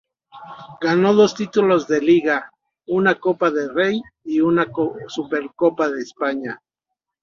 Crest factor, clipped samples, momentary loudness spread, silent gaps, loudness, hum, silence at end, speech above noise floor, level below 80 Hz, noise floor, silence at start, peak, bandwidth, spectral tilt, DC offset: 18 dB; under 0.1%; 12 LU; none; -19 LUFS; none; 0.65 s; 63 dB; -62 dBFS; -82 dBFS; 0.35 s; -2 dBFS; 7.4 kHz; -6 dB/octave; under 0.1%